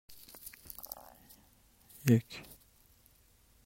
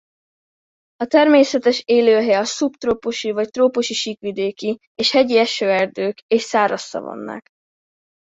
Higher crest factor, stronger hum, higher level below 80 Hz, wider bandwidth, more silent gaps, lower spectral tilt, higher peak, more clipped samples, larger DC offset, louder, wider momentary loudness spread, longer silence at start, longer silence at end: first, 28 dB vs 18 dB; neither; second, -68 dBFS vs -60 dBFS; first, 16.5 kHz vs 8 kHz; second, none vs 4.87-4.95 s, 6.22-6.29 s; first, -6.5 dB/octave vs -3.5 dB/octave; second, -10 dBFS vs -2 dBFS; neither; neither; second, -34 LUFS vs -18 LUFS; first, 28 LU vs 13 LU; second, 0.1 s vs 1 s; first, 1.25 s vs 0.9 s